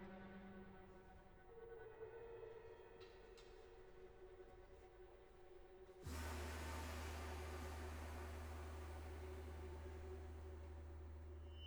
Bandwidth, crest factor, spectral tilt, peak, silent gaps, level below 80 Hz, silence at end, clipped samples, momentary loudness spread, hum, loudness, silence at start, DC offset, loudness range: over 20 kHz; 16 dB; -5.5 dB/octave; -38 dBFS; none; -58 dBFS; 0 s; under 0.1%; 14 LU; none; -56 LUFS; 0 s; under 0.1%; 10 LU